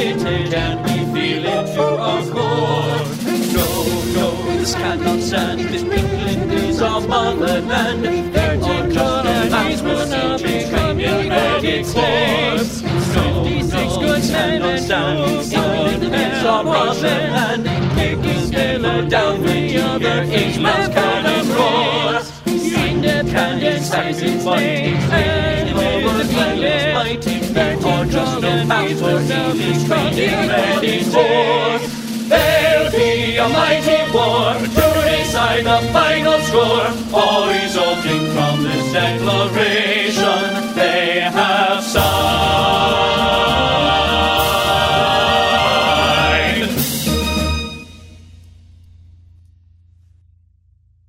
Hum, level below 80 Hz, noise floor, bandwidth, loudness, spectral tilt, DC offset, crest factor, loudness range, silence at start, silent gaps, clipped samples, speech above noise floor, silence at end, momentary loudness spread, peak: none; -34 dBFS; -54 dBFS; 16 kHz; -16 LUFS; -4.5 dB/octave; under 0.1%; 16 dB; 4 LU; 0 s; none; under 0.1%; 38 dB; 2.7 s; 5 LU; 0 dBFS